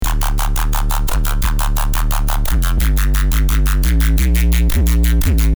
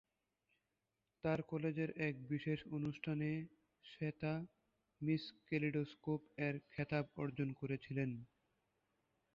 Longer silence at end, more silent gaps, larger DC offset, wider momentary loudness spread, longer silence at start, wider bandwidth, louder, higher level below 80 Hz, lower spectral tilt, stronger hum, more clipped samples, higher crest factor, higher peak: second, 0.05 s vs 1.1 s; neither; neither; about the same, 4 LU vs 6 LU; second, 0 s vs 1.25 s; first, over 20 kHz vs 7 kHz; first, -17 LUFS vs -43 LUFS; first, -14 dBFS vs -74 dBFS; second, -4.5 dB/octave vs -6.5 dB/octave; neither; neither; second, 10 dB vs 18 dB; first, -2 dBFS vs -26 dBFS